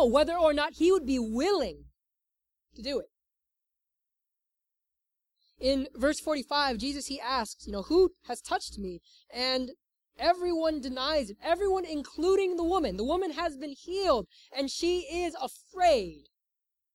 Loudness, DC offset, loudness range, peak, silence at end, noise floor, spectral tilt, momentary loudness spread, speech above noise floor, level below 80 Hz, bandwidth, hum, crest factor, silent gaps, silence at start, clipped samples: -29 LUFS; under 0.1%; 8 LU; -10 dBFS; 0.75 s; -87 dBFS; -4 dB/octave; 13 LU; 58 dB; -52 dBFS; 14 kHz; none; 20 dB; none; 0 s; under 0.1%